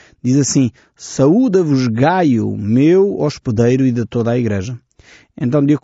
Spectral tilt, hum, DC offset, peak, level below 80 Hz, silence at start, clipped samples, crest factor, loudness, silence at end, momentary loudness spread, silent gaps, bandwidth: -7.5 dB/octave; none; under 0.1%; -2 dBFS; -50 dBFS; 0.25 s; under 0.1%; 12 dB; -15 LUFS; 0.05 s; 10 LU; none; 8 kHz